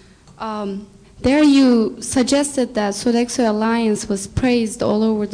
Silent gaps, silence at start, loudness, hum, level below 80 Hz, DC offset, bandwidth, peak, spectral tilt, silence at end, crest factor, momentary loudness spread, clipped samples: none; 0.4 s; -18 LUFS; none; -42 dBFS; under 0.1%; 10.5 kHz; -6 dBFS; -4.5 dB/octave; 0 s; 12 dB; 13 LU; under 0.1%